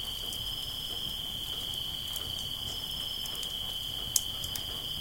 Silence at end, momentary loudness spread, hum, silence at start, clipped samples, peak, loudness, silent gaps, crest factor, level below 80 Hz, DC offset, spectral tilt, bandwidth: 0 s; 5 LU; none; 0 s; under 0.1%; -4 dBFS; -33 LUFS; none; 32 dB; -52 dBFS; under 0.1%; -1 dB/octave; 17 kHz